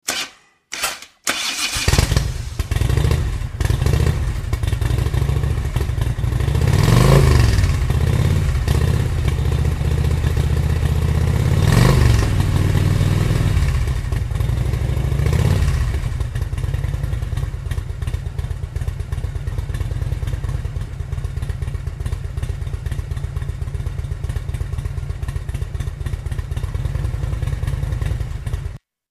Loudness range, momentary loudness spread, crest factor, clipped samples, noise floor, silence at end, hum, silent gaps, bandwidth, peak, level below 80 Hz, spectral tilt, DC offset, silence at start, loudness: 10 LU; 11 LU; 18 dB; under 0.1%; -40 dBFS; 0.35 s; none; none; 15.5 kHz; 0 dBFS; -22 dBFS; -5.5 dB/octave; under 0.1%; 0.05 s; -20 LUFS